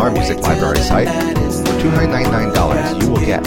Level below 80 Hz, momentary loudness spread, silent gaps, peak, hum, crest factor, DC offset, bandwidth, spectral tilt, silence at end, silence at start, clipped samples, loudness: -24 dBFS; 2 LU; none; -2 dBFS; none; 14 dB; under 0.1%; 17 kHz; -6 dB/octave; 0 s; 0 s; under 0.1%; -15 LUFS